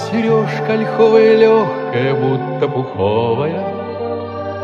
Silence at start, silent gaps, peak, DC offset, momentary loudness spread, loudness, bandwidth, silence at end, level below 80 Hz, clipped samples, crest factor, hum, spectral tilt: 0 s; none; 0 dBFS; under 0.1%; 13 LU; -15 LUFS; 7.2 kHz; 0 s; -60 dBFS; under 0.1%; 14 dB; none; -7.5 dB/octave